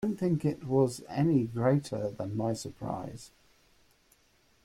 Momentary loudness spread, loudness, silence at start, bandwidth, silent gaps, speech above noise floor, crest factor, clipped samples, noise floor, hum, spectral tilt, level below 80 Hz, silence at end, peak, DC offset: 10 LU; -31 LUFS; 0 s; 14 kHz; none; 37 dB; 16 dB; under 0.1%; -67 dBFS; none; -7.5 dB/octave; -62 dBFS; 1.4 s; -16 dBFS; under 0.1%